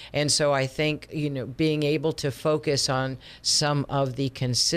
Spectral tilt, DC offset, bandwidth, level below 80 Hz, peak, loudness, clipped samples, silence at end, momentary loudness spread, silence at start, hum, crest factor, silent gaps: -4 dB/octave; under 0.1%; 15.5 kHz; -54 dBFS; -10 dBFS; -25 LUFS; under 0.1%; 0 s; 8 LU; 0 s; none; 14 dB; none